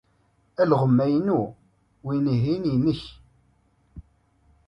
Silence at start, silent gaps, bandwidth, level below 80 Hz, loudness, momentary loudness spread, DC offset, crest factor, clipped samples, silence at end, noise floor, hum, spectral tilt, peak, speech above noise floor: 0.6 s; none; 6 kHz; -54 dBFS; -23 LUFS; 16 LU; under 0.1%; 18 dB; under 0.1%; 0.65 s; -65 dBFS; none; -9.5 dB/octave; -6 dBFS; 43 dB